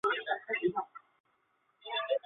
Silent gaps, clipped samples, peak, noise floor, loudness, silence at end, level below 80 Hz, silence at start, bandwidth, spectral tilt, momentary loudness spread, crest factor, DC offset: 1.20-1.24 s; under 0.1%; -18 dBFS; -75 dBFS; -34 LUFS; 0.1 s; -80 dBFS; 0.05 s; 4.3 kHz; -1 dB/octave; 13 LU; 18 dB; under 0.1%